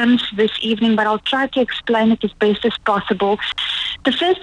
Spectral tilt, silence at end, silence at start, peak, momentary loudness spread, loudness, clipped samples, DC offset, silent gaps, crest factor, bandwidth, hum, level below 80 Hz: -5.5 dB/octave; 0 s; 0 s; -2 dBFS; 4 LU; -18 LUFS; under 0.1%; under 0.1%; none; 16 dB; 10 kHz; none; -50 dBFS